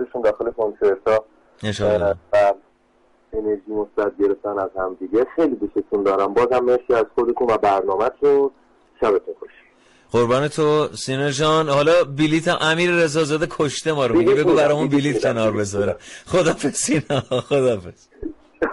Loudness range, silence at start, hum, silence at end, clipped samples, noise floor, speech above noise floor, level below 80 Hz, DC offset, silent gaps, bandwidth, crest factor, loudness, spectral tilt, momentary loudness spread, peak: 4 LU; 0 s; none; 0 s; under 0.1%; -58 dBFS; 39 dB; -50 dBFS; under 0.1%; none; 11.5 kHz; 12 dB; -19 LUFS; -5 dB/octave; 8 LU; -8 dBFS